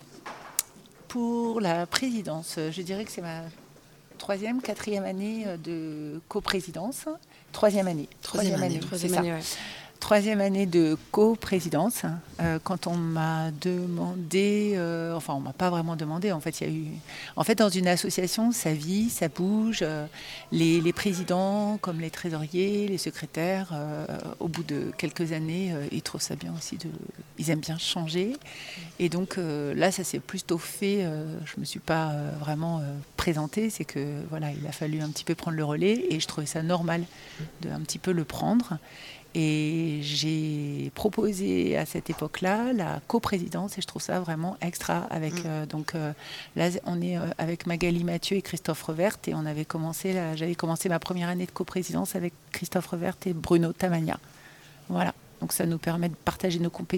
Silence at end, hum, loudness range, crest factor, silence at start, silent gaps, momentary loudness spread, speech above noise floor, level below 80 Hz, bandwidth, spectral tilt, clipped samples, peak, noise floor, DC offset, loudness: 0 s; none; 5 LU; 26 dB; 0 s; none; 10 LU; 25 dB; -58 dBFS; 18.5 kHz; -5 dB/octave; under 0.1%; -2 dBFS; -53 dBFS; under 0.1%; -29 LUFS